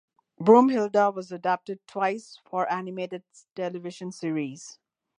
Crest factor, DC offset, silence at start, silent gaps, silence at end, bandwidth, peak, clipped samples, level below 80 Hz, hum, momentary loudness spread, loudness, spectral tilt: 22 dB; under 0.1%; 0.4 s; none; 0.45 s; 10.5 kHz; -4 dBFS; under 0.1%; -80 dBFS; none; 19 LU; -26 LUFS; -6 dB/octave